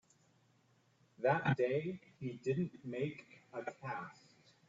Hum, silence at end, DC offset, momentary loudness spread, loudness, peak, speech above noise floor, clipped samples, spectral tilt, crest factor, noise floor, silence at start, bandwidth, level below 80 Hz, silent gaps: none; 0.55 s; under 0.1%; 13 LU; -39 LUFS; -20 dBFS; 34 dB; under 0.1%; -6 dB/octave; 20 dB; -73 dBFS; 1.2 s; 7.8 kHz; -76 dBFS; none